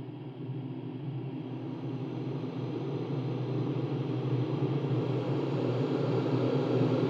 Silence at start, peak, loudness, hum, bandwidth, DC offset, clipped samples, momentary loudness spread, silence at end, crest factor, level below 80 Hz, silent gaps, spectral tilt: 0 s; -16 dBFS; -33 LUFS; none; 7 kHz; under 0.1%; under 0.1%; 9 LU; 0 s; 16 dB; -76 dBFS; none; -9.5 dB/octave